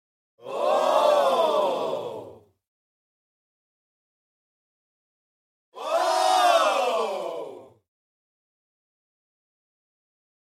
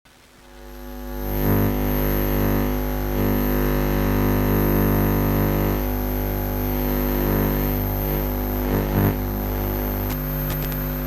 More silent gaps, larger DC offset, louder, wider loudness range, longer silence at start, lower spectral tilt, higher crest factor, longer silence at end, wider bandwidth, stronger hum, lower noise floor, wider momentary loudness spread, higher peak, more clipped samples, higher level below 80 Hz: first, 2.67-5.72 s vs none; neither; about the same, -23 LUFS vs -22 LUFS; first, 13 LU vs 3 LU; about the same, 0.45 s vs 0.45 s; second, -2 dB/octave vs -7 dB/octave; first, 20 dB vs 14 dB; first, 2.9 s vs 0 s; about the same, 16 kHz vs 16 kHz; neither; about the same, -45 dBFS vs -48 dBFS; first, 17 LU vs 5 LU; about the same, -8 dBFS vs -6 dBFS; neither; second, -84 dBFS vs -26 dBFS